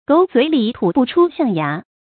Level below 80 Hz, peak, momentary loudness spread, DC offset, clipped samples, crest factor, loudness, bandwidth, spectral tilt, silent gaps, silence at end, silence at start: -58 dBFS; -2 dBFS; 7 LU; under 0.1%; under 0.1%; 14 dB; -16 LUFS; 4.6 kHz; -11.5 dB/octave; none; 0.3 s; 0.1 s